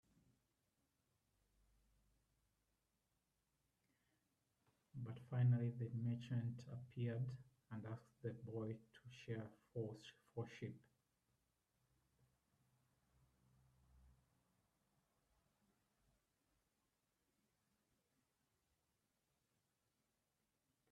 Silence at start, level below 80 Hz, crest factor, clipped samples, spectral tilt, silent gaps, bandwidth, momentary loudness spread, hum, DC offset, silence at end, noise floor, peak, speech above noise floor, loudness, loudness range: 4.95 s; -84 dBFS; 22 dB; under 0.1%; -8.5 dB/octave; none; 7.2 kHz; 16 LU; none; under 0.1%; 6.85 s; -89 dBFS; -30 dBFS; 42 dB; -48 LUFS; 14 LU